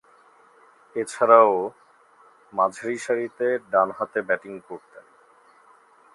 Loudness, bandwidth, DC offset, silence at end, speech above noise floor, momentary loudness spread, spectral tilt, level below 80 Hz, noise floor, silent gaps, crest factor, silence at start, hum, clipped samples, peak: -22 LUFS; 11.5 kHz; under 0.1%; 1.35 s; 33 dB; 20 LU; -4.5 dB/octave; -76 dBFS; -56 dBFS; none; 24 dB; 0.95 s; none; under 0.1%; -2 dBFS